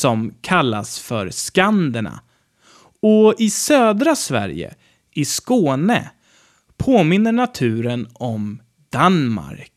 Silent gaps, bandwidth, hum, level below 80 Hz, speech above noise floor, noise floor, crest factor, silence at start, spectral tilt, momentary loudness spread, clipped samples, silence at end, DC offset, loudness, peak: none; 15 kHz; none; -52 dBFS; 38 dB; -56 dBFS; 16 dB; 0 s; -5 dB/octave; 13 LU; under 0.1%; 0.15 s; under 0.1%; -18 LUFS; -2 dBFS